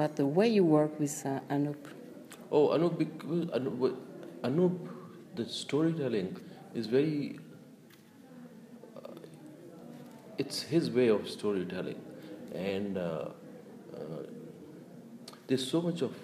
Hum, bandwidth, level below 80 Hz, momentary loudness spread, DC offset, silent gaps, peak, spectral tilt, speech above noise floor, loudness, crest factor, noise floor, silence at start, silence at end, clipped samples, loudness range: none; 15.5 kHz; -80 dBFS; 22 LU; under 0.1%; none; -14 dBFS; -6 dB/octave; 25 dB; -32 LUFS; 18 dB; -56 dBFS; 0 s; 0 s; under 0.1%; 9 LU